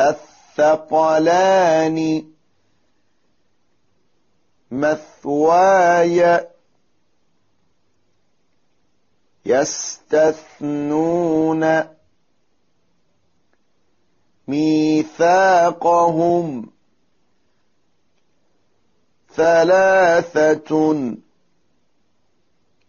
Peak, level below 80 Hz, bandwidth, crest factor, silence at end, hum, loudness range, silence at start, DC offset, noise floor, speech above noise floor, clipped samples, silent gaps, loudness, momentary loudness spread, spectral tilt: -4 dBFS; -60 dBFS; 7.2 kHz; 14 dB; 1.75 s; none; 9 LU; 0 s; under 0.1%; -68 dBFS; 53 dB; under 0.1%; none; -16 LUFS; 14 LU; -4.5 dB/octave